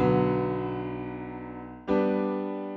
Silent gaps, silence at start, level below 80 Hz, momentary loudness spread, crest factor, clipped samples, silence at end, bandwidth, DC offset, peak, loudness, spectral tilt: none; 0 s; -52 dBFS; 14 LU; 18 dB; under 0.1%; 0 s; 6 kHz; under 0.1%; -10 dBFS; -29 LUFS; -7.5 dB/octave